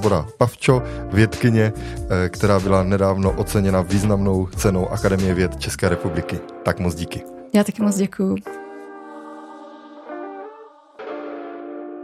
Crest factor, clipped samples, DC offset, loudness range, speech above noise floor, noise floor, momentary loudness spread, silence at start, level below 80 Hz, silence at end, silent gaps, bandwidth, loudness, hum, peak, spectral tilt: 20 dB; under 0.1%; under 0.1%; 12 LU; 25 dB; -44 dBFS; 20 LU; 0 s; -38 dBFS; 0 s; none; 15 kHz; -20 LUFS; none; 0 dBFS; -6.5 dB/octave